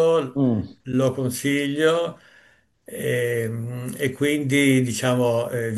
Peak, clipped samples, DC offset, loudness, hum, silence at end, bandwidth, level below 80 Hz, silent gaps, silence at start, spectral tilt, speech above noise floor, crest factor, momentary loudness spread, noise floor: -6 dBFS; under 0.1%; under 0.1%; -22 LUFS; none; 0 s; 13 kHz; -62 dBFS; none; 0 s; -5.5 dB/octave; 36 dB; 18 dB; 10 LU; -57 dBFS